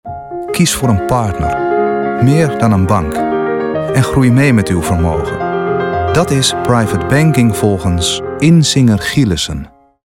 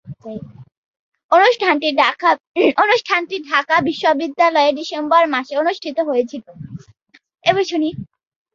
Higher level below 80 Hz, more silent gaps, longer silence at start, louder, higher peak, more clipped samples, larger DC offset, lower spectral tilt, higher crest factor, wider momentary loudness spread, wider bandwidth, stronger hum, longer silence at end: first, -34 dBFS vs -60 dBFS; second, none vs 0.77-1.12 s, 1.24-1.29 s, 2.40-2.54 s; about the same, 0.05 s vs 0.05 s; first, -12 LUFS vs -16 LUFS; about the same, 0 dBFS vs -2 dBFS; neither; neither; about the same, -5.5 dB/octave vs -4.5 dB/octave; about the same, 12 dB vs 16 dB; second, 7 LU vs 19 LU; first, 17 kHz vs 7.4 kHz; neither; second, 0.35 s vs 0.5 s